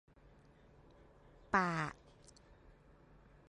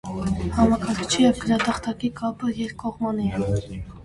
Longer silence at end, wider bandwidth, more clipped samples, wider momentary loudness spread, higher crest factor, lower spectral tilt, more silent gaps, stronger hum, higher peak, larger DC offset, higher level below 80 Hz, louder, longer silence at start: first, 1.55 s vs 0 s; about the same, 11 kHz vs 11.5 kHz; neither; first, 28 LU vs 9 LU; first, 26 dB vs 18 dB; about the same, -5.5 dB/octave vs -5.5 dB/octave; neither; neither; second, -18 dBFS vs -6 dBFS; neither; second, -66 dBFS vs -40 dBFS; second, -37 LUFS vs -24 LUFS; first, 1.5 s vs 0.05 s